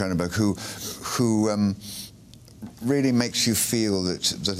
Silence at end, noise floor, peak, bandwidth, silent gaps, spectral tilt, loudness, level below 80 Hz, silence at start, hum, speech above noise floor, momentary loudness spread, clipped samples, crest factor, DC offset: 0 s; -48 dBFS; -8 dBFS; 15.5 kHz; none; -4 dB/octave; -24 LUFS; -54 dBFS; 0 s; none; 24 dB; 15 LU; under 0.1%; 18 dB; under 0.1%